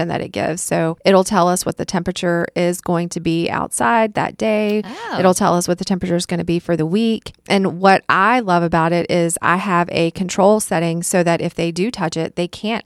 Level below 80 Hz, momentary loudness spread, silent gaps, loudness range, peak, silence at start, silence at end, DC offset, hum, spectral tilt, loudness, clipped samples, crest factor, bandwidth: -48 dBFS; 7 LU; none; 2 LU; 0 dBFS; 0 s; 0.05 s; under 0.1%; none; -5 dB/octave; -17 LUFS; under 0.1%; 16 dB; 14.5 kHz